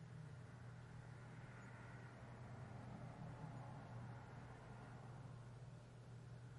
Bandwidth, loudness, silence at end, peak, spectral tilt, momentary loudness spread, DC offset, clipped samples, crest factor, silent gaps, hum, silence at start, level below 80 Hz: 11 kHz; -57 LUFS; 0 s; -42 dBFS; -7 dB/octave; 4 LU; under 0.1%; under 0.1%; 14 dB; none; none; 0 s; -72 dBFS